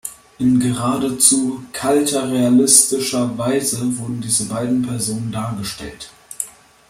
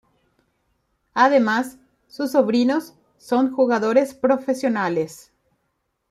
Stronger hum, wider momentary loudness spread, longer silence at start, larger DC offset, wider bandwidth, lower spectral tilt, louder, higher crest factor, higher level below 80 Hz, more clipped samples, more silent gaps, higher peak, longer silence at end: neither; first, 16 LU vs 10 LU; second, 0.05 s vs 1.15 s; neither; about the same, 16 kHz vs 15 kHz; second, -3.5 dB/octave vs -5.5 dB/octave; first, -17 LUFS vs -20 LUFS; about the same, 18 dB vs 18 dB; first, -52 dBFS vs -68 dBFS; neither; neither; first, 0 dBFS vs -4 dBFS; second, 0.4 s vs 0.95 s